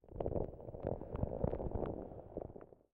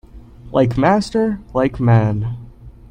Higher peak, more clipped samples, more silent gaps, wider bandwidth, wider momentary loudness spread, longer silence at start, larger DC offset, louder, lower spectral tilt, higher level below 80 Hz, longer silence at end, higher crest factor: second, -22 dBFS vs 0 dBFS; neither; neither; second, 3.8 kHz vs 9.6 kHz; about the same, 9 LU vs 9 LU; about the same, 0.05 s vs 0.15 s; neither; second, -43 LUFS vs -17 LUFS; first, -12 dB/octave vs -8 dB/octave; second, -50 dBFS vs -38 dBFS; about the same, 0.2 s vs 0.2 s; about the same, 20 dB vs 18 dB